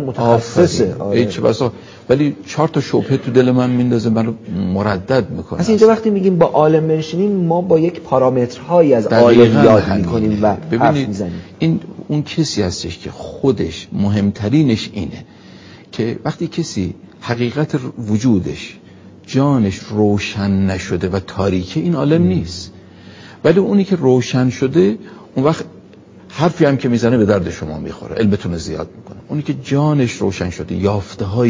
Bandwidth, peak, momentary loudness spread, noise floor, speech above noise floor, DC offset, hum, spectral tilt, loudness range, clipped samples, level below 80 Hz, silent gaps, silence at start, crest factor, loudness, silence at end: 7.6 kHz; 0 dBFS; 12 LU; -41 dBFS; 26 dB; under 0.1%; none; -7 dB/octave; 7 LU; under 0.1%; -40 dBFS; none; 0 s; 16 dB; -16 LUFS; 0 s